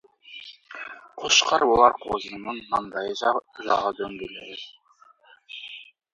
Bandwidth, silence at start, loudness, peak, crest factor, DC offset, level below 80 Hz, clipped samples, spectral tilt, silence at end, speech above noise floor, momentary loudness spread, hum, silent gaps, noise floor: 8 kHz; 0.3 s; -23 LUFS; -2 dBFS; 24 dB; under 0.1%; -58 dBFS; under 0.1%; -1.5 dB/octave; 0.3 s; 33 dB; 23 LU; none; none; -57 dBFS